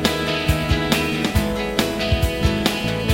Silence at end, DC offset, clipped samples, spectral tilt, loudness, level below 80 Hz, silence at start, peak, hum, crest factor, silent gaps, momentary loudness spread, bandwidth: 0 s; under 0.1%; under 0.1%; -5 dB/octave; -20 LUFS; -28 dBFS; 0 s; -2 dBFS; none; 18 dB; none; 2 LU; 17 kHz